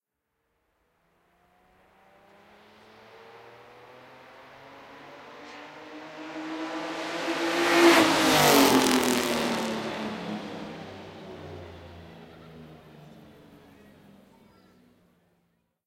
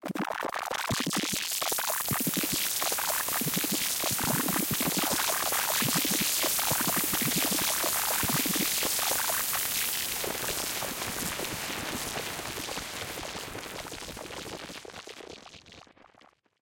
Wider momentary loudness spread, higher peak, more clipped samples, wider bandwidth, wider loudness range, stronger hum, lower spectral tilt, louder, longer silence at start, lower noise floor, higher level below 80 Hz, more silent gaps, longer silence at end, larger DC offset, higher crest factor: first, 29 LU vs 14 LU; first, -2 dBFS vs -12 dBFS; neither; about the same, 17 kHz vs 17.5 kHz; first, 25 LU vs 12 LU; neither; first, -3 dB/octave vs -1.5 dB/octave; first, -23 LUFS vs -28 LUFS; first, 3.3 s vs 0 s; first, -80 dBFS vs -61 dBFS; about the same, -62 dBFS vs -58 dBFS; neither; first, 3.1 s vs 0.8 s; neither; first, 28 dB vs 18 dB